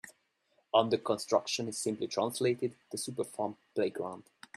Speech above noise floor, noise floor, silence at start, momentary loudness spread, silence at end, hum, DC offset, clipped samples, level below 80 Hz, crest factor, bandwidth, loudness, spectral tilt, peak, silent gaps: 42 dB; -74 dBFS; 0.05 s; 10 LU; 0.35 s; none; under 0.1%; under 0.1%; -78 dBFS; 22 dB; 14.5 kHz; -33 LUFS; -4 dB/octave; -12 dBFS; none